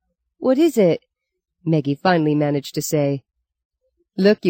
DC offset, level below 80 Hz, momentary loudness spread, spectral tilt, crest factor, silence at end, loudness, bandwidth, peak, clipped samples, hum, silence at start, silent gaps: under 0.1%; -66 dBFS; 10 LU; -6 dB/octave; 16 dB; 0 s; -19 LUFS; 17 kHz; -4 dBFS; under 0.1%; none; 0.4 s; 3.65-3.70 s